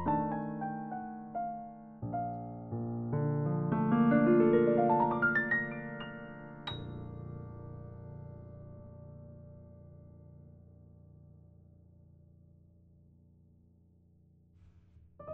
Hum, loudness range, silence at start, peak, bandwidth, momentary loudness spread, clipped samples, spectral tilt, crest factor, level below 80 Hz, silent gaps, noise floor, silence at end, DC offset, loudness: none; 23 LU; 0 s; -16 dBFS; 4.4 kHz; 25 LU; under 0.1%; -6.5 dB/octave; 20 dB; -64 dBFS; none; -64 dBFS; 0 s; under 0.1%; -32 LUFS